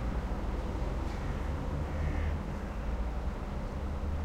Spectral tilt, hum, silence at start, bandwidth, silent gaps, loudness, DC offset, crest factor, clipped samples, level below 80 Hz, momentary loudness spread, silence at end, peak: -7.5 dB/octave; none; 0 s; 10.5 kHz; none; -37 LUFS; under 0.1%; 12 dB; under 0.1%; -36 dBFS; 4 LU; 0 s; -20 dBFS